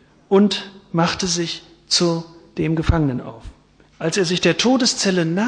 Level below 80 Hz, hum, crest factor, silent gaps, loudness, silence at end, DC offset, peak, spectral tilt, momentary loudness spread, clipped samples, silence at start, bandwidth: -38 dBFS; none; 18 dB; none; -19 LUFS; 0 s; under 0.1%; -2 dBFS; -4.5 dB/octave; 11 LU; under 0.1%; 0.3 s; 10 kHz